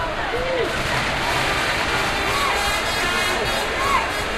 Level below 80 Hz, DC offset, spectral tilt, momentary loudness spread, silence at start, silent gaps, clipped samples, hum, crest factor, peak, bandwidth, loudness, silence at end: -36 dBFS; under 0.1%; -3 dB/octave; 3 LU; 0 s; none; under 0.1%; none; 14 dB; -6 dBFS; 14 kHz; -20 LUFS; 0 s